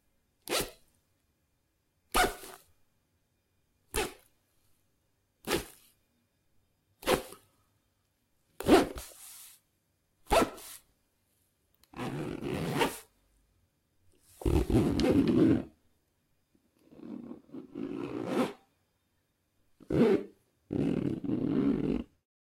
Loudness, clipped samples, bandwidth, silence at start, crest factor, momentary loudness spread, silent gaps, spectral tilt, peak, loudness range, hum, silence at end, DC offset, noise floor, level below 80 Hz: -31 LUFS; under 0.1%; 16.5 kHz; 0.45 s; 26 dB; 22 LU; none; -5.5 dB/octave; -8 dBFS; 9 LU; none; 0.45 s; under 0.1%; -76 dBFS; -48 dBFS